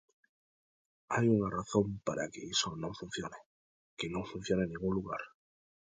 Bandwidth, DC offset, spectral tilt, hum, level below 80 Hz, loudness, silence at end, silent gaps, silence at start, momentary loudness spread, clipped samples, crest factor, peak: 9.6 kHz; under 0.1%; -5 dB/octave; none; -60 dBFS; -35 LUFS; 0.55 s; 3.46-3.97 s; 1.1 s; 12 LU; under 0.1%; 20 dB; -16 dBFS